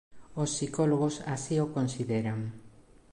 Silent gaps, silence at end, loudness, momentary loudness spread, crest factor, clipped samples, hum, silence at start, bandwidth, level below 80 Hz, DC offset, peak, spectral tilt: none; 0.3 s; -31 LUFS; 9 LU; 16 dB; under 0.1%; none; 0.1 s; 11.5 kHz; -62 dBFS; under 0.1%; -16 dBFS; -6 dB/octave